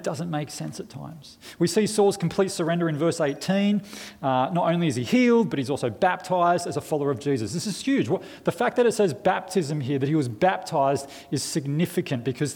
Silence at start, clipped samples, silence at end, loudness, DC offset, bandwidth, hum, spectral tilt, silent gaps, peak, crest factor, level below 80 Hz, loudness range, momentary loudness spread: 0 s; under 0.1%; 0 s; -24 LUFS; under 0.1%; 18.5 kHz; none; -5.5 dB/octave; none; -8 dBFS; 16 dB; -64 dBFS; 2 LU; 9 LU